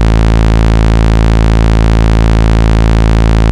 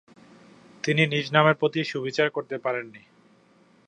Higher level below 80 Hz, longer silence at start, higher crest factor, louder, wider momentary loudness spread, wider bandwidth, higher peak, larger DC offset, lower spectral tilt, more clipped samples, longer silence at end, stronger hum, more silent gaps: first, -8 dBFS vs -74 dBFS; second, 0 s vs 0.85 s; second, 6 dB vs 24 dB; first, -9 LUFS vs -24 LUFS; second, 0 LU vs 11 LU; about the same, 9 kHz vs 9.6 kHz; about the same, 0 dBFS vs -2 dBFS; first, 1% vs under 0.1%; first, -7 dB/octave vs -5.5 dB/octave; first, 7% vs under 0.1%; second, 0 s vs 0.9 s; neither; neither